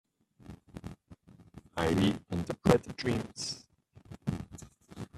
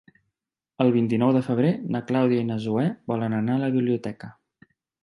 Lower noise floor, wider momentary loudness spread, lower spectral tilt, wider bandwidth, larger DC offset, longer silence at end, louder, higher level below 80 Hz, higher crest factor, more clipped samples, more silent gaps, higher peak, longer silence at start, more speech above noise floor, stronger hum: second, -57 dBFS vs -83 dBFS; first, 24 LU vs 7 LU; second, -6 dB/octave vs -9 dB/octave; first, 14 kHz vs 9.6 kHz; neither; second, 0 s vs 0.7 s; second, -32 LUFS vs -24 LUFS; first, -54 dBFS vs -66 dBFS; first, 28 dB vs 18 dB; neither; neither; about the same, -6 dBFS vs -6 dBFS; second, 0.5 s vs 0.8 s; second, 26 dB vs 61 dB; neither